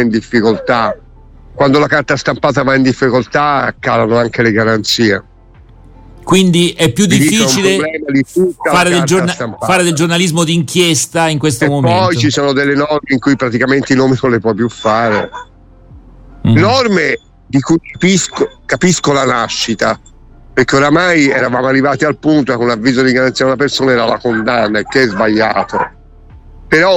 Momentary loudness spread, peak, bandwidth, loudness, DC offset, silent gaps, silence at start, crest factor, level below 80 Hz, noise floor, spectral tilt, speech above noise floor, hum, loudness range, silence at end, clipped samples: 6 LU; 0 dBFS; 16.5 kHz; -12 LUFS; under 0.1%; none; 0 s; 12 dB; -40 dBFS; -40 dBFS; -4.5 dB/octave; 28 dB; none; 2 LU; 0 s; under 0.1%